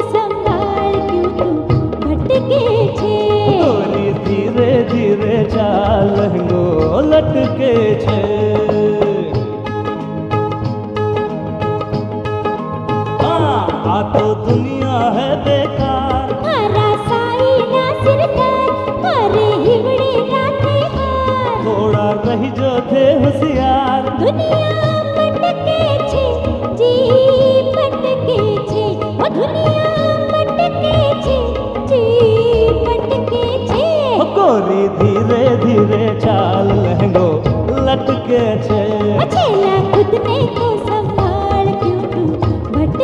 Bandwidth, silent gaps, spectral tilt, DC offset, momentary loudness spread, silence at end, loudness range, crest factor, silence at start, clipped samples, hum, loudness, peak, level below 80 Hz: 9.6 kHz; none; -8 dB/octave; under 0.1%; 6 LU; 0 s; 3 LU; 12 dB; 0 s; under 0.1%; none; -14 LUFS; 0 dBFS; -32 dBFS